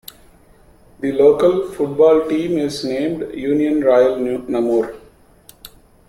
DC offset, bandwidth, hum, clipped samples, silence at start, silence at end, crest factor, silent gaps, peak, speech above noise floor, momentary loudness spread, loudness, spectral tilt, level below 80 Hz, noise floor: under 0.1%; 15 kHz; none; under 0.1%; 1 s; 0.4 s; 16 dB; none; -2 dBFS; 33 dB; 9 LU; -17 LUFS; -6.5 dB/octave; -50 dBFS; -49 dBFS